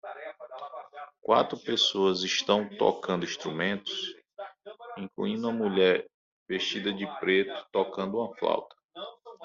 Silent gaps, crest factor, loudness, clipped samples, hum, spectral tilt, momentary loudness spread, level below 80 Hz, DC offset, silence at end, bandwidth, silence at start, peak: 6.14-6.46 s, 8.84-8.89 s; 20 dB; -28 LUFS; under 0.1%; none; -2.5 dB/octave; 18 LU; -72 dBFS; under 0.1%; 0 s; 7.6 kHz; 0.05 s; -8 dBFS